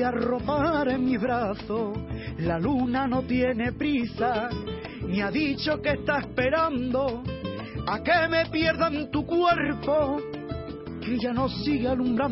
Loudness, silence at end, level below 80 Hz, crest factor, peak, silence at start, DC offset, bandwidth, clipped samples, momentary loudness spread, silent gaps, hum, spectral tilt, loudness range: -26 LUFS; 0 s; -44 dBFS; 16 dB; -10 dBFS; 0 s; under 0.1%; 5.8 kHz; under 0.1%; 10 LU; none; none; -10 dB/octave; 2 LU